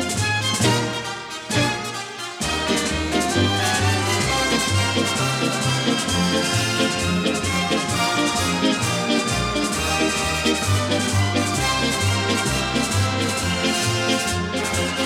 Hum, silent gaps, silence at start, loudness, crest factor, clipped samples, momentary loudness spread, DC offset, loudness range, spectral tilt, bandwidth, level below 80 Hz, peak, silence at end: none; none; 0 s; -20 LUFS; 16 dB; under 0.1%; 4 LU; under 0.1%; 2 LU; -3.5 dB/octave; 17 kHz; -42 dBFS; -6 dBFS; 0 s